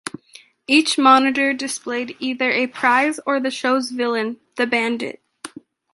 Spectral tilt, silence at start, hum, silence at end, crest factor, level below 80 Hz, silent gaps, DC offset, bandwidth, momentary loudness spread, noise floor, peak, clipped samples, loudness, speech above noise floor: -2.5 dB/octave; 0.05 s; none; 0.45 s; 18 dB; -70 dBFS; none; under 0.1%; 11.5 kHz; 19 LU; -49 dBFS; -2 dBFS; under 0.1%; -19 LUFS; 30 dB